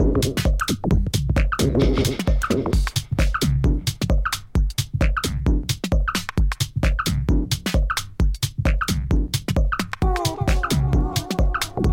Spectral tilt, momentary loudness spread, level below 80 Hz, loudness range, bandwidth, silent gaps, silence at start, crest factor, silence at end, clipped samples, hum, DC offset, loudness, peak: -5 dB/octave; 3 LU; -24 dBFS; 2 LU; 17 kHz; none; 0 s; 14 dB; 0 s; under 0.1%; none; under 0.1%; -22 LUFS; -6 dBFS